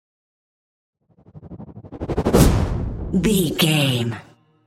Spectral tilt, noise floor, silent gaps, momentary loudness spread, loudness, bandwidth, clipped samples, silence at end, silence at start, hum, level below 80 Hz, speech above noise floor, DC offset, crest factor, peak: -5 dB/octave; -46 dBFS; none; 23 LU; -19 LUFS; 16 kHz; under 0.1%; 0.45 s; 1.35 s; none; -30 dBFS; 27 dB; under 0.1%; 20 dB; 0 dBFS